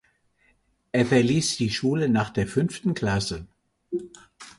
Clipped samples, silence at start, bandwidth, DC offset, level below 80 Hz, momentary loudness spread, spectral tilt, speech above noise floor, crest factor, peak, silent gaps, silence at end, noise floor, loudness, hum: under 0.1%; 0.95 s; 11.5 kHz; under 0.1%; -50 dBFS; 13 LU; -5.5 dB/octave; 42 dB; 18 dB; -8 dBFS; none; 0.1 s; -66 dBFS; -24 LUFS; none